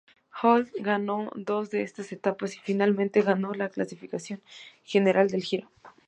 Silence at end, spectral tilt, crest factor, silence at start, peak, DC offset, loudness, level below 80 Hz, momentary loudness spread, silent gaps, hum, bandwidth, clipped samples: 0.2 s; -6 dB/octave; 20 dB; 0.35 s; -8 dBFS; under 0.1%; -27 LUFS; -78 dBFS; 13 LU; none; none; 9 kHz; under 0.1%